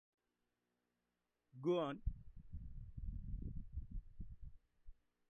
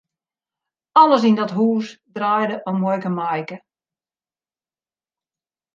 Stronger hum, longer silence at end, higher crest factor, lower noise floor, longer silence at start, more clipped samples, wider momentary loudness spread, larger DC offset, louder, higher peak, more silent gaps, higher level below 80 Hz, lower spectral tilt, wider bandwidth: first, 60 Hz at -70 dBFS vs none; second, 0.4 s vs 2.15 s; about the same, 20 dB vs 20 dB; about the same, -89 dBFS vs under -90 dBFS; first, 1.55 s vs 0.95 s; neither; first, 20 LU vs 14 LU; neither; second, -47 LUFS vs -18 LUFS; second, -28 dBFS vs -2 dBFS; neither; first, -52 dBFS vs -74 dBFS; about the same, -7 dB/octave vs -7 dB/octave; second, 6.6 kHz vs 7.4 kHz